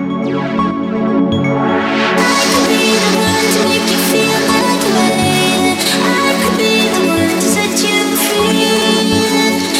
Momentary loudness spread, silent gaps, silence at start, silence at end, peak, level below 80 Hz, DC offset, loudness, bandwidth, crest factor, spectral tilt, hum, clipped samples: 3 LU; none; 0 s; 0 s; 0 dBFS; -46 dBFS; under 0.1%; -12 LUFS; 16.5 kHz; 12 dB; -3.5 dB/octave; none; under 0.1%